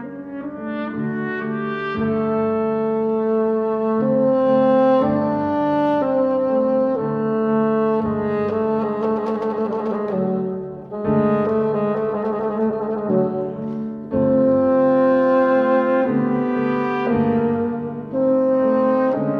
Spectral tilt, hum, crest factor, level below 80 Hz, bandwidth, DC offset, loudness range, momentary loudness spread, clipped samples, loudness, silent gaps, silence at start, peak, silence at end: -9.5 dB/octave; none; 12 dB; -54 dBFS; 5.4 kHz; under 0.1%; 4 LU; 9 LU; under 0.1%; -19 LUFS; none; 0 s; -6 dBFS; 0 s